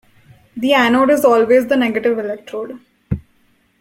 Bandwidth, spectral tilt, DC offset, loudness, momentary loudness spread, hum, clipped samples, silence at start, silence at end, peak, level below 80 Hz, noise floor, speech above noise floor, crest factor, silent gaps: 16.5 kHz; -5.5 dB/octave; under 0.1%; -15 LUFS; 16 LU; none; under 0.1%; 0.55 s; 0.6 s; -2 dBFS; -46 dBFS; -57 dBFS; 43 dB; 14 dB; none